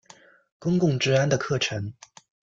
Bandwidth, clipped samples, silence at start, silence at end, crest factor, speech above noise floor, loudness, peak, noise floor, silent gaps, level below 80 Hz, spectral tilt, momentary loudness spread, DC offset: 7.6 kHz; under 0.1%; 0.6 s; 0.65 s; 18 dB; 30 dB; -24 LUFS; -8 dBFS; -54 dBFS; none; -60 dBFS; -5.5 dB/octave; 12 LU; under 0.1%